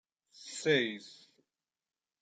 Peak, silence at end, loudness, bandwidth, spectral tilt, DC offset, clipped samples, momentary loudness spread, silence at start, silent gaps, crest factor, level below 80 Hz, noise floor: -16 dBFS; 1.1 s; -32 LUFS; 9.4 kHz; -3.5 dB/octave; under 0.1%; under 0.1%; 22 LU; 0.4 s; none; 22 dB; -80 dBFS; under -90 dBFS